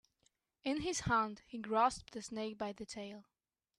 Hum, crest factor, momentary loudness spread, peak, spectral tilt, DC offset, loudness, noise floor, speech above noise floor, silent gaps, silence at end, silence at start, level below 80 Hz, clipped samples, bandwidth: none; 20 dB; 14 LU; -18 dBFS; -4 dB/octave; under 0.1%; -38 LUFS; -79 dBFS; 41 dB; none; 0.55 s; 0.65 s; -62 dBFS; under 0.1%; 13 kHz